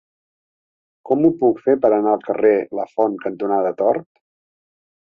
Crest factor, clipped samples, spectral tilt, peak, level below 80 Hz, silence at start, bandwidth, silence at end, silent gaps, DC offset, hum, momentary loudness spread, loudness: 18 dB; under 0.1%; -10 dB/octave; -2 dBFS; -64 dBFS; 1.05 s; 3.8 kHz; 1.05 s; none; under 0.1%; none; 6 LU; -18 LUFS